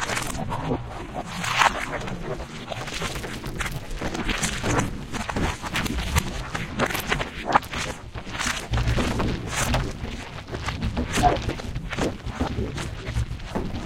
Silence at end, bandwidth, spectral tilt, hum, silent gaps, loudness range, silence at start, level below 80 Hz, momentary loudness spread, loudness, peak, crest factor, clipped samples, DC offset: 0 s; 17 kHz; -4 dB/octave; none; none; 2 LU; 0 s; -34 dBFS; 10 LU; -27 LUFS; -2 dBFS; 24 dB; under 0.1%; under 0.1%